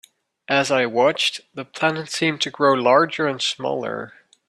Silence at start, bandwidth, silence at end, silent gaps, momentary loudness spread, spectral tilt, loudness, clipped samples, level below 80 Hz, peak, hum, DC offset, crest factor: 0.5 s; 13.5 kHz; 0.4 s; none; 13 LU; -3.5 dB/octave; -20 LUFS; under 0.1%; -68 dBFS; -2 dBFS; none; under 0.1%; 18 dB